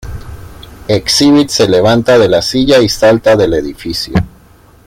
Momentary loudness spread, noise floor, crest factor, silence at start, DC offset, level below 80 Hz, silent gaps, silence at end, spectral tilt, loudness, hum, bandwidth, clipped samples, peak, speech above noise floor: 12 LU; -42 dBFS; 10 dB; 0.05 s; under 0.1%; -32 dBFS; none; 0.6 s; -4.5 dB/octave; -10 LUFS; none; 16.5 kHz; under 0.1%; 0 dBFS; 33 dB